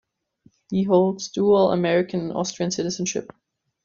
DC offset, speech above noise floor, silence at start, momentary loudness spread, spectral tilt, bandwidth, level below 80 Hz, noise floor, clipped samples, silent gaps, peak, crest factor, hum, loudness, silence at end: under 0.1%; 38 dB; 0.7 s; 9 LU; -5 dB/octave; 7.6 kHz; -62 dBFS; -60 dBFS; under 0.1%; none; -6 dBFS; 16 dB; none; -22 LUFS; 0.6 s